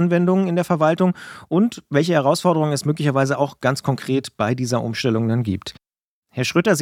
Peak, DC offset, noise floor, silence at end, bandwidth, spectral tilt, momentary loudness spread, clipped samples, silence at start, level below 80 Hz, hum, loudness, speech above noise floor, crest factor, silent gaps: -2 dBFS; under 0.1%; -74 dBFS; 0 s; 15.5 kHz; -6 dB/octave; 6 LU; under 0.1%; 0 s; -60 dBFS; none; -20 LUFS; 55 dB; 18 dB; 6.03-6.22 s